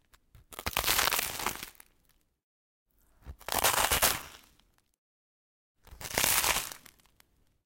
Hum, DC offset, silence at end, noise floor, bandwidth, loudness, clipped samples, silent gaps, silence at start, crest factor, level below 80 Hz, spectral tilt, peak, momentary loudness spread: none; under 0.1%; 0.9 s; -70 dBFS; 17 kHz; -28 LUFS; under 0.1%; 2.44-2.86 s, 4.98-5.75 s; 0.5 s; 30 dB; -52 dBFS; -0.5 dB/octave; -4 dBFS; 21 LU